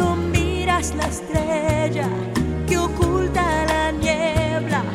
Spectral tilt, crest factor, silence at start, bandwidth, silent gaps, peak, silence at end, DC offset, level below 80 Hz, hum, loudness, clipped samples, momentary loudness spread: -5.5 dB/octave; 16 dB; 0 s; 15.5 kHz; none; -4 dBFS; 0 s; under 0.1%; -30 dBFS; none; -21 LUFS; under 0.1%; 4 LU